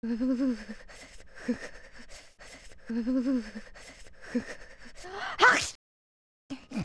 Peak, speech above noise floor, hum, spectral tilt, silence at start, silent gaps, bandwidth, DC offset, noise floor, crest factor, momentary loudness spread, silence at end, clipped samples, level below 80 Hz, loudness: -8 dBFS; 18 dB; none; -3.5 dB/octave; 0 s; 5.75-6.49 s; 11 kHz; under 0.1%; -50 dBFS; 24 dB; 27 LU; 0 s; under 0.1%; -54 dBFS; -29 LUFS